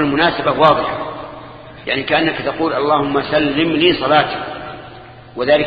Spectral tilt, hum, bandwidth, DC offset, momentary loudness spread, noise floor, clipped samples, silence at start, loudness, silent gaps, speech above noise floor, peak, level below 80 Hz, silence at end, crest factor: -8 dB/octave; none; 5 kHz; under 0.1%; 20 LU; -37 dBFS; under 0.1%; 0 s; -15 LUFS; none; 22 dB; 0 dBFS; -46 dBFS; 0 s; 16 dB